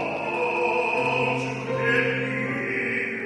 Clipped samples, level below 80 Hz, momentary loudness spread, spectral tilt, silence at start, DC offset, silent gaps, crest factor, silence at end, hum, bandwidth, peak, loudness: under 0.1%; -62 dBFS; 5 LU; -5.5 dB/octave; 0 s; under 0.1%; none; 16 dB; 0 s; none; 11.5 kHz; -8 dBFS; -24 LUFS